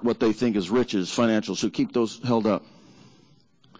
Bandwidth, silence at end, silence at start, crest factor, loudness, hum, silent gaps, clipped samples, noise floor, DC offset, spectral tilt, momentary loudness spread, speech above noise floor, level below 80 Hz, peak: 8 kHz; 1.15 s; 0 s; 16 dB; -24 LUFS; none; none; under 0.1%; -59 dBFS; under 0.1%; -5.5 dB/octave; 3 LU; 35 dB; -60 dBFS; -10 dBFS